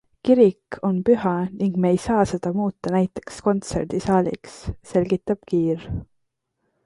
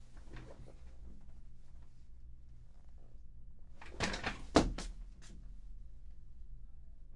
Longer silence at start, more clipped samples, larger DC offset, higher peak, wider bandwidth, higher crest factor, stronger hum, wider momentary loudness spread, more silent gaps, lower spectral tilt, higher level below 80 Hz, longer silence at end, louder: first, 0.25 s vs 0 s; neither; neither; first, -4 dBFS vs -10 dBFS; about the same, 11.5 kHz vs 11.5 kHz; second, 18 dB vs 32 dB; neither; second, 9 LU vs 26 LU; neither; first, -7.5 dB/octave vs -4.5 dB/octave; about the same, -46 dBFS vs -50 dBFS; first, 0.8 s vs 0 s; first, -22 LUFS vs -37 LUFS